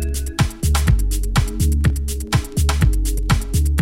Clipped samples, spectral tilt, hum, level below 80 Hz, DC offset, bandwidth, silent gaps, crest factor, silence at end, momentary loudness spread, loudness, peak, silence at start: under 0.1%; -5 dB/octave; none; -20 dBFS; under 0.1%; 16.5 kHz; none; 14 dB; 0 s; 4 LU; -20 LUFS; -4 dBFS; 0 s